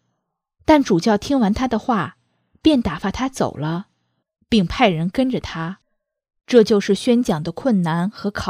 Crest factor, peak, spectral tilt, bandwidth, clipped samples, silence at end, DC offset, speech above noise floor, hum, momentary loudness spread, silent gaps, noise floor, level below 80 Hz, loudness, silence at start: 18 dB; 0 dBFS; -6 dB/octave; 15 kHz; under 0.1%; 0 s; under 0.1%; 58 dB; none; 11 LU; none; -76 dBFS; -42 dBFS; -19 LUFS; 0.7 s